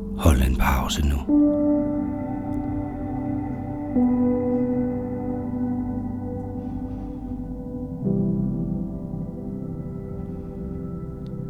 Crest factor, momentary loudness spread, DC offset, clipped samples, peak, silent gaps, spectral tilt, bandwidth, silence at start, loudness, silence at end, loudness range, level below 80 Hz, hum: 22 dB; 13 LU; under 0.1%; under 0.1%; -4 dBFS; none; -7 dB/octave; 16 kHz; 0 s; -26 LUFS; 0 s; 5 LU; -32 dBFS; none